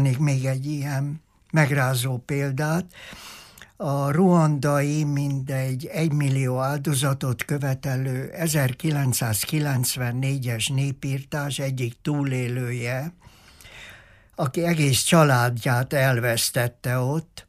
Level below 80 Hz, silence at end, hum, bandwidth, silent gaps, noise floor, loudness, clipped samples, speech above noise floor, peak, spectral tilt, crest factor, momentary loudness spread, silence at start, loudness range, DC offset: -56 dBFS; 0.05 s; none; 15.5 kHz; none; -49 dBFS; -23 LUFS; under 0.1%; 26 dB; -6 dBFS; -5 dB/octave; 18 dB; 10 LU; 0 s; 5 LU; under 0.1%